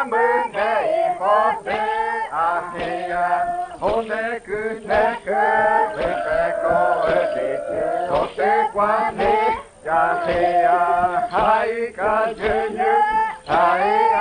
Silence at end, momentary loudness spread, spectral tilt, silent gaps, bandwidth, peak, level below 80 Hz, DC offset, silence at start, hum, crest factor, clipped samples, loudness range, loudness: 0 s; 7 LU; -5 dB/octave; none; 9.8 kHz; -4 dBFS; -46 dBFS; under 0.1%; 0 s; none; 16 dB; under 0.1%; 3 LU; -20 LUFS